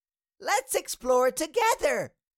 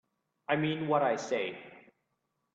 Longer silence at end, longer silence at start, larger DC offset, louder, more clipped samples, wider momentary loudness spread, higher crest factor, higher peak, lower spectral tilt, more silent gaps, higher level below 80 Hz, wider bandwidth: second, 0.3 s vs 0.75 s; about the same, 0.4 s vs 0.5 s; neither; first, -26 LUFS vs -31 LUFS; neither; second, 6 LU vs 15 LU; second, 14 dB vs 20 dB; about the same, -12 dBFS vs -14 dBFS; second, -1.5 dB/octave vs -5.5 dB/octave; neither; first, -60 dBFS vs -76 dBFS; first, 17 kHz vs 8 kHz